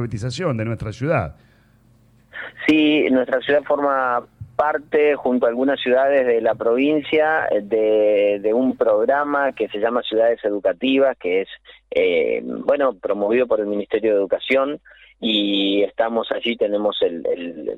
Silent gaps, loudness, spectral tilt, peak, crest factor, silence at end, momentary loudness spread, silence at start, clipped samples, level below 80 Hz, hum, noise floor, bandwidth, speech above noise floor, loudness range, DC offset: none; -19 LUFS; -6.5 dB/octave; -6 dBFS; 14 dB; 0 s; 8 LU; 0 s; under 0.1%; -54 dBFS; none; -54 dBFS; 9.2 kHz; 35 dB; 3 LU; under 0.1%